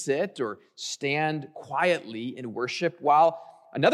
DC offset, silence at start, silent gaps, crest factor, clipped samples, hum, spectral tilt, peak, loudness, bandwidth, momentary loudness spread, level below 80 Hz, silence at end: under 0.1%; 0 s; none; 18 dB; under 0.1%; none; -4.5 dB/octave; -8 dBFS; -27 LUFS; 13 kHz; 15 LU; -80 dBFS; 0 s